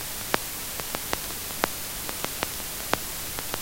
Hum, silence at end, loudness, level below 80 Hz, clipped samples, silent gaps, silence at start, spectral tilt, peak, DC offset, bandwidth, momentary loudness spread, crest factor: none; 0 s; -29 LUFS; -48 dBFS; under 0.1%; none; 0 s; -1.5 dB/octave; 0 dBFS; under 0.1%; 17 kHz; 3 LU; 30 dB